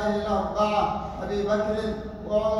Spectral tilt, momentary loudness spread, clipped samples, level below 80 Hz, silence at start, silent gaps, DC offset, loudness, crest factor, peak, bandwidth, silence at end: -6.5 dB/octave; 8 LU; under 0.1%; -42 dBFS; 0 s; none; under 0.1%; -26 LUFS; 14 dB; -10 dBFS; 11.5 kHz; 0 s